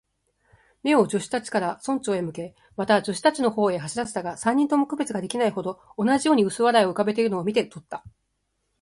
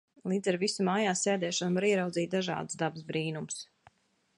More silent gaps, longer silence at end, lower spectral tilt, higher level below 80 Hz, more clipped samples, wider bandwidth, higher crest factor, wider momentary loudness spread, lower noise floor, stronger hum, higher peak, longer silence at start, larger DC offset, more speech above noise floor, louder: neither; about the same, 0.75 s vs 0.75 s; about the same, -5 dB/octave vs -4.5 dB/octave; first, -64 dBFS vs -76 dBFS; neither; about the same, 11.5 kHz vs 11.5 kHz; about the same, 18 dB vs 16 dB; first, 12 LU vs 8 LU; first, -75 dBFS vs -67 dBFS; neither; first, -6 dBFS vs -16 dBFS; first, 0.85 s vs 0.25 s; neither; first, 51 dB vs 36 dB; first, -24 LUFS vs -31 LUFS